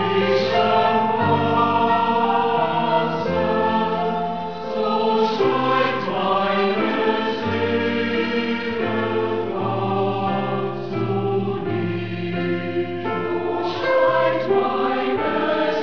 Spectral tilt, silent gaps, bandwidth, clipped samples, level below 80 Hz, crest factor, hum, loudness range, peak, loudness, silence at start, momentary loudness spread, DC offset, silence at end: -7 dB/octave; none; 5.4 kHz; under 0.1%; -56 dBFS; 14 dB; none; 4 LU; -6 dBFS; -21 LUFS; 0 s; 6 LU; 1%; 0 s